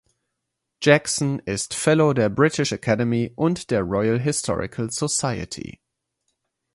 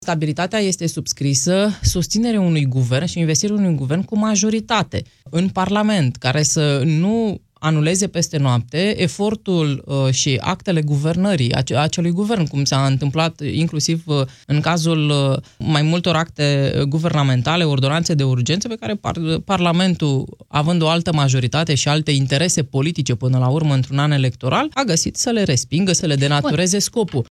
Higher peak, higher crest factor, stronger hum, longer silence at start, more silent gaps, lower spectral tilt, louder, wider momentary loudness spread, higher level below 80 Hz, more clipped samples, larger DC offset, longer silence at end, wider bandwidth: first, 0 dBFS vs -4 dBFS; first, 22 dB vs 14 dB; neither; first, 0.8 s vs 0 s; neither; about the same, -4.5 dB/octave vs -5 dB/octave; second, -22 LUFS vs -18 LUFS; first, 9 LU vs 4 LU; second, -50 dBFS vs -44 dBFS; neither; neither; first, 1.05 s vs 0.05 s; second, 11.5 kHz vs 13 kHz